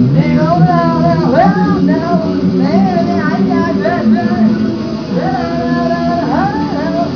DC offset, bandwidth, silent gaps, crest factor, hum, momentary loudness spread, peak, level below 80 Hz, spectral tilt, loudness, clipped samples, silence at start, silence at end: 0.4%; 5.4 kHz; none; 12 dB; none; 6 LU; 0 dBFS; -40 dBFS; -8.5 dB/octave; -12 LUFS; under 0.1%; 0 s; 0 s